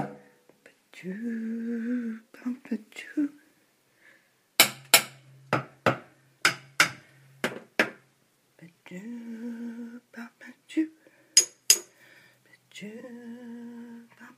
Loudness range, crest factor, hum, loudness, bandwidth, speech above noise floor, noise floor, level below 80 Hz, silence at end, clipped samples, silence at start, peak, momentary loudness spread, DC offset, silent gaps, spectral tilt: 10 LU; 32 dB; none; -26 LUFS; 15.5 kHz; 34 dB; -67 dBFS; -78 dBFS; 0.1 s; under 0.1%; 0 s; 0 dBFS; 22 LU; under 0.1%; none; -1.5 dB/octave